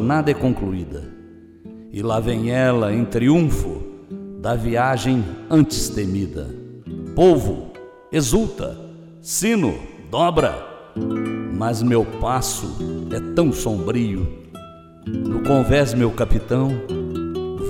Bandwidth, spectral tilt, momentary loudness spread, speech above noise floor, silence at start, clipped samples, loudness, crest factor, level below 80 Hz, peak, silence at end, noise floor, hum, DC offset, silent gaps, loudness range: 16.5 kHz; -6 dB/octave; 17 LU; 23 dB; 0 s; under 0.1%; -20 LUFS; 18 dB; -34 dBFS; -4 dBFS; 0 s; -42 dBFS; none; under 0.1%; none; 2 LU